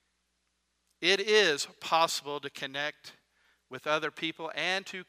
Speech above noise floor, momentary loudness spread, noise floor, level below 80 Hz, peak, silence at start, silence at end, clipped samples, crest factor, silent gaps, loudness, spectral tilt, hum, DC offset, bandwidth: 47 dB; 13 LU; -78 dBFS; -84 dBFS; -8 dBFS; 1 s; 0.05 s; under 0.1%; 24 dB; none; -29 LUFS; -2 dB/octave; none; under 0.1%; 15.5 kHz